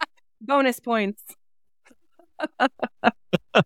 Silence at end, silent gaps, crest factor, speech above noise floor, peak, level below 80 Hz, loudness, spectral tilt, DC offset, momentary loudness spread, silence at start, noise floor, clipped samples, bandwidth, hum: 0 s; none; 24 dB; 42 dB; -2 dBFS; -66 dBFS; -24 LUFS; -5.5 dB/octave; 0.1%; 17 LU; 0 s; -65 dBFS; under 0.1%; 17.5 kHz; none